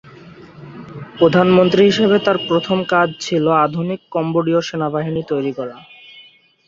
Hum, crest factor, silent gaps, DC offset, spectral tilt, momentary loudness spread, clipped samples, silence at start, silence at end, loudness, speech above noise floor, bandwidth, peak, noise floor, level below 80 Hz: none; 16 dB; none; under 0.1%; -6.5 dB/octave; 17 LU; under 0.1%; 0.05 s; 0.45 s; -16 LUFS; 31 dB; 7.6 kHz; 0 dBFS; -47 dBFS; -56 dBFS